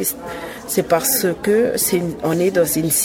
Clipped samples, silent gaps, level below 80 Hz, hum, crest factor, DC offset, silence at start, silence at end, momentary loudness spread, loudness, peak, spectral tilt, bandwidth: under 0.1%; none; -48 dBFS; none; 16 dB; under 0.1%; 0 s; 0 s; 9 LU; -17 LUFS; -2 dBFS; -4 dB/octave; 19 kHz